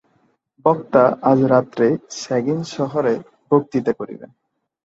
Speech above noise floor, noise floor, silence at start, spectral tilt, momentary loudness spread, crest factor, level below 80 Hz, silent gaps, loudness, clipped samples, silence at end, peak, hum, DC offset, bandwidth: 45 dB; -63 dBFS; 0.65 s; -7 dB/octave; 10 LU; 18 dB; -62 dBFS; none; -19 LUFS; under 0.1%; 0.6 s; -2 dBFS; none; under 0.1%; 8 kHz